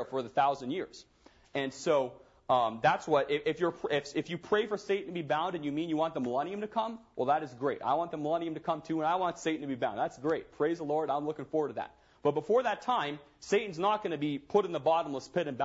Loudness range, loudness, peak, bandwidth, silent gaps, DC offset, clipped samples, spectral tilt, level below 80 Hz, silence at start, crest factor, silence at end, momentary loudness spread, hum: 2 LU; -32 LUFS; -12 dBFS; 8 kHz; none; under 0.1%; under 0.1%; -5.5 dB/octave; -70 dBFS; 0 s; 18 dB; 0 s; 7 LU; none